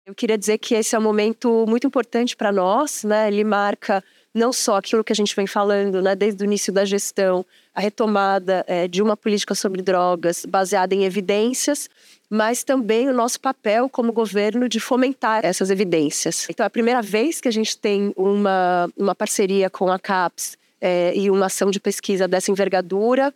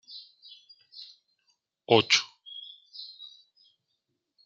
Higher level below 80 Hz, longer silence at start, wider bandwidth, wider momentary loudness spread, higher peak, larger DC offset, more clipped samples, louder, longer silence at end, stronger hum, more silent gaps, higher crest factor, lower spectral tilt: about the same, -78 dBFS vs -80 dBFS; about the same, 0.05 s vs 0.1 s; first, 17 kHz vs 9.2 kHz; second, 4 LU vs 27 LU; about the same, -6 dBFS vs -6 dBFS; neither; neither; first, -20 LUFS vs -23 LUFS; second, 0.05 s vs 1.4 s; neither; neither; second, 14 dB vs 26 dB; about the same, -4 dB/octave vs -3 dB/octave